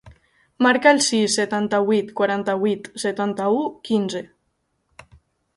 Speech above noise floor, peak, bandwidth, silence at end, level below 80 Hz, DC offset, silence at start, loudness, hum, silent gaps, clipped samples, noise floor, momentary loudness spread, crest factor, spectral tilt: 51 dB; 0 dBFS; 11.5 kHz; 1.3 s; -62 dBFS; under 0.1%; 0.05 s; -20 LUFS; none; none; under 0.1%; -71 dBFS; 9 LU; 20 dB; -3.5 dB/octave